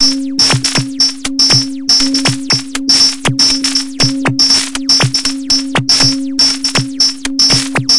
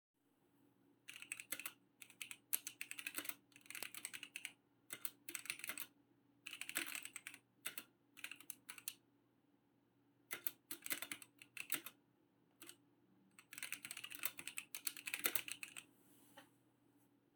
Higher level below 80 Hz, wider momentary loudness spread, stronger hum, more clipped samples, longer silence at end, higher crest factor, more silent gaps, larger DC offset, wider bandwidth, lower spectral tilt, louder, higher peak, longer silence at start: first, -40 dBFS vs under -90 dBFS; second, 5 LU vs 16 LU; neither; neither; second, 0 s vs 0.35 s; second, 12 dB vs 36 dB; neither; neither; second, 11.5 kHz vs over 20 kHz; first, -2 dB/octave vs 0.5 dB/octave; first, -10 LUFS vs -47 LUFS; first, 0 dBFS vs -16 dBFS; second, 0 s vs 0.6 s